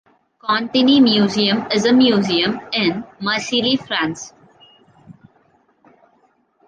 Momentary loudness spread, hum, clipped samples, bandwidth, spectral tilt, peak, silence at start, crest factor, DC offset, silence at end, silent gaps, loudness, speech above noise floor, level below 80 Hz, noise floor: 11 LU; none; under 0.1%; 9 kHz; -4.5 dB/octave; -2 dBFS; 0.45 s; 16 dB; under 0.1%; 1.55 s; none; -16 LUFS; 43 dB; -60 dBFS; -59 dBFS